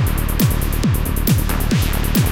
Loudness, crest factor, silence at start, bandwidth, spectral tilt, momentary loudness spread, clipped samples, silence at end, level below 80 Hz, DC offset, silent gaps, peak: -18 LUFS; 12 dB; 0 s; 17.5 kHz; -5.5 dB/octave; 1 LU; under 0.1%; 0 s; -20 dBFS; 0.8%; none; -4 dBFS